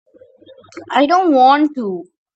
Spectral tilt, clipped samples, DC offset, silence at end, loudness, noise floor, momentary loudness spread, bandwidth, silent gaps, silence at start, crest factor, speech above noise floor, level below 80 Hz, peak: -5 dB/octave; under 0.1%; under 0.1%; 0.3 s; -14 LUFS; -45 dBFS; 14 LU; 8 kHz; none; 0.75 s; 16 dB; 32 dB; -68 dBFS; 0 dBFS